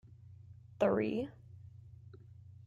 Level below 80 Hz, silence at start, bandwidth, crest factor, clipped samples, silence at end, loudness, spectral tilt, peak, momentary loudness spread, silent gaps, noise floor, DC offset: -68 dBFS; 0.25 s; 7.6 kHz; 22 dB; under 0.1%; 0.1 s; -35 LUFS; -8 dB/octave; -18 dBFS; 25 LU; none; -55 dBFS; under 0.1%